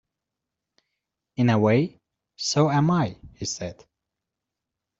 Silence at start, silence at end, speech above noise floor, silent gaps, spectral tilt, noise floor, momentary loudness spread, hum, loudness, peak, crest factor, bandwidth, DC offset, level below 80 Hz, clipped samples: 1.4 s; 1.25 s; 63 dB; none; -5.5 dB/octave; -85 dBFS; 13 LU; none; -23 LUFS; -6 dBFS; 20 dB; 8 kHz; under 0.1%; -60 dBFS; under 0.1%